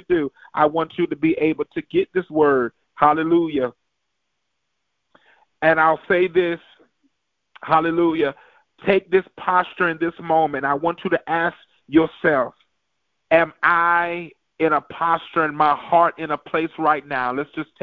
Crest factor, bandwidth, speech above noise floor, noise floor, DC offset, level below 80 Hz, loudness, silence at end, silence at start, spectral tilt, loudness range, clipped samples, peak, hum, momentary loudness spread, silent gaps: 20 dB; 4.8 kHz; 57 dB; -77 dBFS; under 0.1%; -58 dBFS; -20 LUFS; 0.2 s; 0.1 s; -8.5 dB/octave; 3 LU; under 0.1%; 0 dBFS; none; 9 LU; none